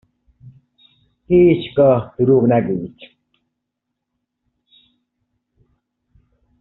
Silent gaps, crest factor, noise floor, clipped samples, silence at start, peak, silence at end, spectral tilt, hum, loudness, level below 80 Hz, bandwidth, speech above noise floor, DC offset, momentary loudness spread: none; 18 dB; -78 dBFS; under 0.1%; 0.45 s; -2 dBFS; 3.55 s; -7.5 dB/octave; none; -15 LUFS; -50 dBFS; 4.1 kHz; 64 dB; under 0.1%; 11 LU